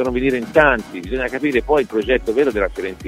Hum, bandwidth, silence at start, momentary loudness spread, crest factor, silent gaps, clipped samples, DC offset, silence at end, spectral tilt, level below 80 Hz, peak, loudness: none; 15.5 kHz; 0 s; 8 LU; 18 dB; none; under 0.1%; under 0.1%; 0 s; -6 dB/octave; -34 dBFS; 0 dBFS; -18 LUFS